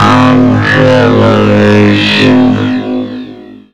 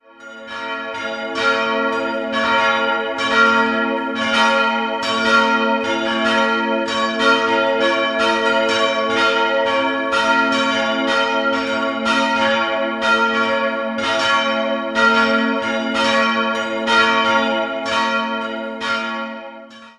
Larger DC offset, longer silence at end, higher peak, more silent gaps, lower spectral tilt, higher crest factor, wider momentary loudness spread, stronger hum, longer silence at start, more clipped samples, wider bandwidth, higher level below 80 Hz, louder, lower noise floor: first, 3% vs under 0.1%; about the same, 0.15 s vs 0.1 s; about the same, 0 dBFS vs -2 dBFS; neither; first, -6.5 dB/octave vs -3 dB/octave; second, 6 dB vs 16 dB; first, 11 LU vs 7 LU; first, 50 Hz at -35 dBFS vs none; second, 0 s vs 0.2 s; neither; second, 9.8 kHz vs 11.5 kHz; first, -36 dBFS vs -56 dBFS; first, -7 LUFS vs -17 LUFS; second, -29 dBFS vs -38 dBFS